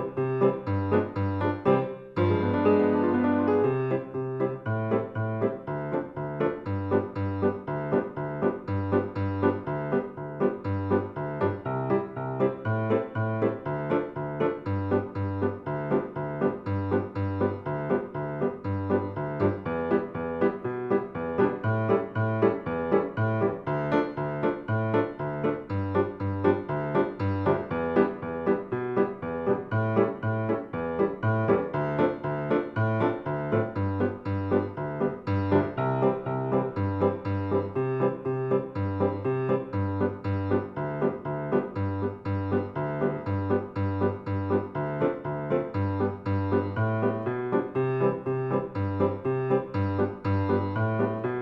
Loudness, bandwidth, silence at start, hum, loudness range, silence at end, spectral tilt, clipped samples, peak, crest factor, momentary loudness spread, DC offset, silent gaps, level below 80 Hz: -28 LUFS; 5.6 kHz; 0 s; none; 3 LU; 0 s; -10.5 dB/octave; under 0.1%; -10 dBFS; 18 dB; 6 LU; under 0.1%; none; -58 dBFS